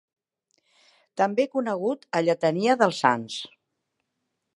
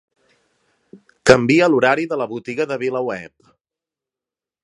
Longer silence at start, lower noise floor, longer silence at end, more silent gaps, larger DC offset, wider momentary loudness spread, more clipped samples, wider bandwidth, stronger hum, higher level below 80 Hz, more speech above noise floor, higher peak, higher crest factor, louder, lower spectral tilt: first, 1.15 s vs 0.95 s; second, -80 dBFS vs -89 dBFS; second, 1.1 s vs 1.35 s; neither; neither; about the same, 14 LU vs 12 LU; neither; about the same, 11.5 kHz vs 11 kHz; neither; second, -78 dBFS vs -54 dBFS; second, 56 dB vs 72 dB; second, -4 dBFS vs 0 dBFS; about the same, 22 dB vs 20 dB; second, -24 LUFS vs -17 LUFS; about the same, -5 dB/octave vs -5 dB/octave